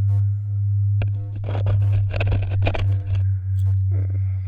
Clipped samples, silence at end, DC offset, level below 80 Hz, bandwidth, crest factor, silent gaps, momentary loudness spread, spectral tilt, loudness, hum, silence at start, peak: under 0.1%; 0 s; under 0.1%; -34 dBFS; 4.1 kHz; 14 dB; none; 3 LU; -9 dB/octave; -22 LUFS; none; 0 s; -6 dBFS